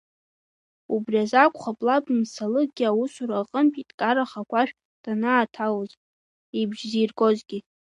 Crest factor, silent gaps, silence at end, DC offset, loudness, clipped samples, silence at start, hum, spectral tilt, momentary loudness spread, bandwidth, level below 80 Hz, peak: 22 dB; 3.94-3.98 s, 4.85-5.04 s, 5.97-6.53 s; 0.35 s; under 0.1%; -24 LUFS; under 0.1%; 0.9 s; none; -5.5 dB/octave; 9 LU; 10.5 kHz; -78 dBFS; -2 dBFS